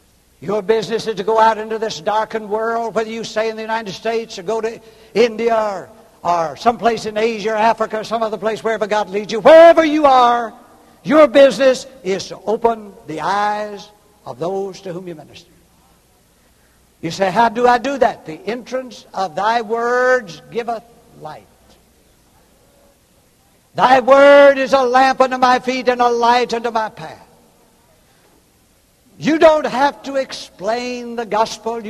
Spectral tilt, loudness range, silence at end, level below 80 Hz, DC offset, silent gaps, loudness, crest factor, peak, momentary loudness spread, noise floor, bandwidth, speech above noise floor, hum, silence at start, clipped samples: -4.5 dB/octave; 11 LU; 0 s; -54 dBFS; under 0.1%; none; -15 LUFS; 16 dB; 0 dBFS; 17 LU; -54 dBFS; 13 kHz; 39 dB; none; 0.4 s; under 0.1%